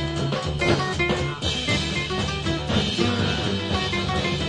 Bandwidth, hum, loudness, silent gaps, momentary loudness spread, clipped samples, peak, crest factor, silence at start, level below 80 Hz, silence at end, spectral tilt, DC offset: 11 kHz; none; -23 LUFS; none; 3 LU; under 0.1%; -6 dBFS; 18 dB; 0 s; -38 dBFS; 0 s; -5 dB/octave; under 0.1%